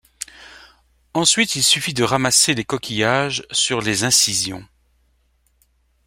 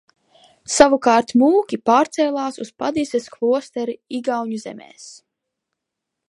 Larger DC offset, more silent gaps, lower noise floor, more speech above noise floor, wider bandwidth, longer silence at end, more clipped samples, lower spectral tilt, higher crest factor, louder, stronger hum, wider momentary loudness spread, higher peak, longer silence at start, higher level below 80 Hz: neither; neither; second, -62 dBFS vs -81 dBFS; second, 44 dB vs 63 dB; first, 16.5 kHz vs 11.5 kHz; first, 1.45 s vs 1.15 s; neither; second, -2 dB/octave vs -3.5 dB/octave; about the same, 20 dB vs 20 dB; about the same, -17 LUFS vs -19 LUFS; neither; second, 12 LU vs 18 LU; about the same, -2 dBFS vs 0 dBFS; second, 0.2 s vs 0.7 s; about the same, -54 dBFS vs -56 dBFS